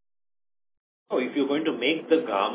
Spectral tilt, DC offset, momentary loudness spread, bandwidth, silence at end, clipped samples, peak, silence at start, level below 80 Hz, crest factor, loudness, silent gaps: -8.5 dB/octave; under 0.1%; 6 LU; 4 kHz; 0 s; under 0.1%; -8 dBFS; 1.1 s; -80 dBFS; 18 dB; -25 LUFS; none